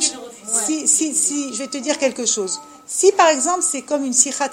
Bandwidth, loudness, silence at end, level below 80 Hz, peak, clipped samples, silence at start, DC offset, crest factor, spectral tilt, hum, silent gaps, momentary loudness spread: 16.5 kHz; -17 LUFS; 0 s; -70 dBFS; 0 dBFS; under 0.1%; 0 s; under 0.1%; 20 dB; -0.5 dB/octave; none; none; 10 LU